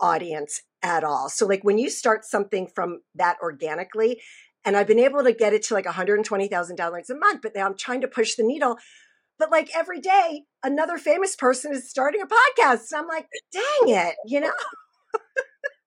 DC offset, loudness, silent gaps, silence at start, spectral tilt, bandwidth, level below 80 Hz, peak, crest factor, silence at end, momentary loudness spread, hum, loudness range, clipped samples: under 0.1%; -23 LUFS; none; 0 s; -3 dB/octave; 13 kHz; -86 dBFS; -6 dBFS; 18 dB; 0.15 s; 11 LU; none; 3 LU; under 0.1%